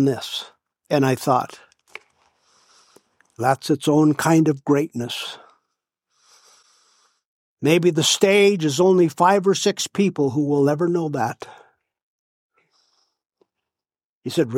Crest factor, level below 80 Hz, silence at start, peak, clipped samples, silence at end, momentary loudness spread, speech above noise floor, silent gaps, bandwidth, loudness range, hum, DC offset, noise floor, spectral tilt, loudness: 20 dB; -70 dBFS; 0 s; -2 dBFS; under 0.1%; 0 s; 13 LU; over 71 dB; 7.25-7.57 s, 12.02-12.50 s, 13.26-13.30 s, 14.05-14.22 s; 16.5 kHz; 9 LU; none; under 0.1%; under -90 dBFS; -5 dB/octave; -19 LUFS